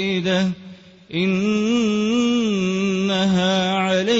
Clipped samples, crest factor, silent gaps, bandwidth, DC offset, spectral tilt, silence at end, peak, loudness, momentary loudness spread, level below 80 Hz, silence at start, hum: under 0.1%; 12 dB; none; 8 kHz; under 0.1%; -5.5 dB/octave; 0 s; -8 dBFS; -20 LUFS; 4 LU; -56 dBFS; 0 s; none